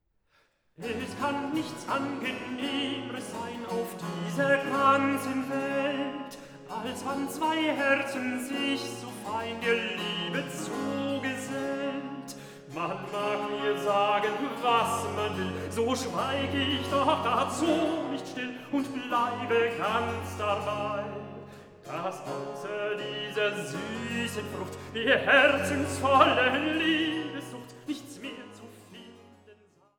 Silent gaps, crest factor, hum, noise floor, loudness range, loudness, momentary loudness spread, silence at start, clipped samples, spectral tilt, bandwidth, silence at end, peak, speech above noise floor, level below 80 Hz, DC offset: none; 24 dB; none; -69 dBFS; 8 LU; -29 LUFS; 14 LU; 0.8 s; under 0.1%; -4.5 dB/octave; 19.5 kHz; 0.45 s; -6 dBFS; 40 dB; -66 dBFS; under 0.1%